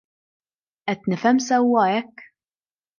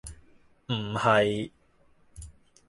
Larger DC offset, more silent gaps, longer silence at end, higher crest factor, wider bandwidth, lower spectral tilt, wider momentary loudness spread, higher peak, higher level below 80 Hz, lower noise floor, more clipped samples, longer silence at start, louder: neither; neither; first, 0.75 s vs 0.4 s; second, 16 dB vs 22 dB; second, 7.2 kHz vs 11.5 kHz; about the same, -5 dB/octave vs -5.5 dB/octave; second, 12 LU vs 26 LU; about the same, -6 dBFS vs -8 dBFS; second, -74 dBFS vs -54 dBFS; first, under -90 dBFS vs -62 dBFS; neither; first, 0.85 s vs 0.05 s; first, -20 LUFS vs -26 LUFS